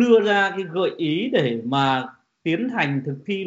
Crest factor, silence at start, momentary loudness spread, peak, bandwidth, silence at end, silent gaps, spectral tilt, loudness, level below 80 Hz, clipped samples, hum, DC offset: 16 dB; 0 s; 9 LU; -6 dBFS; 7.8 kHz; 0 s; none; -4 dB/octave; -22 LUFS; -68 dBFS; under 0.1%; none; under 0.1%